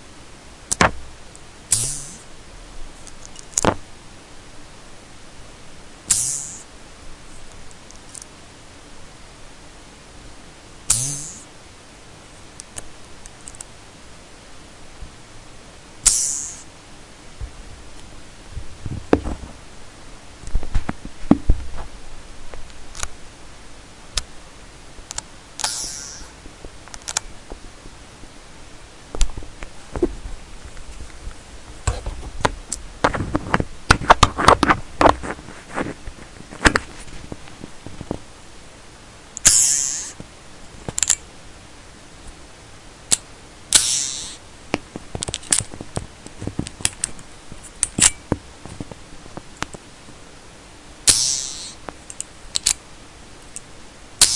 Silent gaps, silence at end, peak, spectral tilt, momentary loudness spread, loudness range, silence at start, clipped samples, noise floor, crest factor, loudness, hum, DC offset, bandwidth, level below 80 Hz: none; 0 s; 0 dBFS; -2 dB/octave; 27 LU; 14 LU; 0 s; under 0.1%; -42 dBFS; 24 dB; -20 LUFS; none; under 0.1%; 12 kHz; -34 dBFS